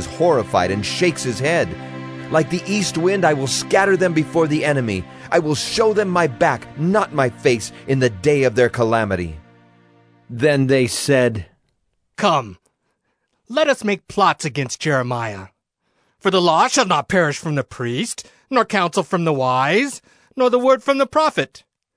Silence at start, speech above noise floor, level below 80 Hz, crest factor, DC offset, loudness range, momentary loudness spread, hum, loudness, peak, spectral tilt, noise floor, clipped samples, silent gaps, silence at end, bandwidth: 0 s; 52 dB; -52 dBFS; 16 dB; under 0.1%; 3 LU; 9 LU; none; -18 LUFS; -2 dBFS; -5 dB/octave; -70 dBFS; under 0.1%; none; 0.4 s; 11 kHz